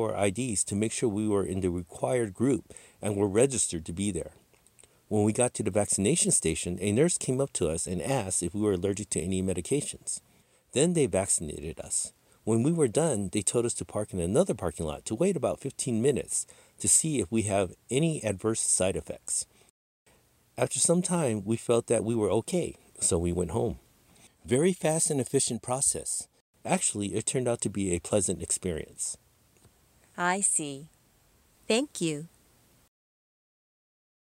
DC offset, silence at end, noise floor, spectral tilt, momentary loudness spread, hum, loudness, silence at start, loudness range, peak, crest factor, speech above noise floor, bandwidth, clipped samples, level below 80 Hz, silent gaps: under 0.1%; 1.95 s; -64 dBFS; -4.5 dB/octave; 9 LU; none; -28 LUFS; 0 s; 4 LU; -8 dBFS; 22 dB; 36 dB; 16 kHz; under 0.1%; -58 dBFS; 19.70-20.06 s, 26.41-26.54 s